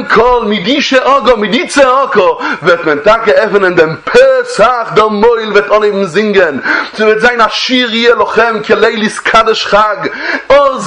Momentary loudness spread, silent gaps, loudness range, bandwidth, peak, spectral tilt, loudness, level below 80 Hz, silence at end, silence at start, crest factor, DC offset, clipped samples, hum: 4 LU; none; 1 LU; 11 kHz; 0 dBFS; -4 dB/octave; -8 LUFS; -40 dBFS; 0 s; 0 s; 8 dB; under 0.1%; 0.9%; none